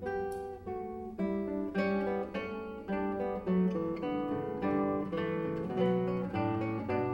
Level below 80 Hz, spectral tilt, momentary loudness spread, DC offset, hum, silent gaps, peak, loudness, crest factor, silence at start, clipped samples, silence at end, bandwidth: -58 dBFS; -9 dB/octave; 9 LU; under 0.1%; none; none; -18 dBFS; -34 LUFS; 14 dB; 0 s; under 0.1%; 0 s; 10 kHz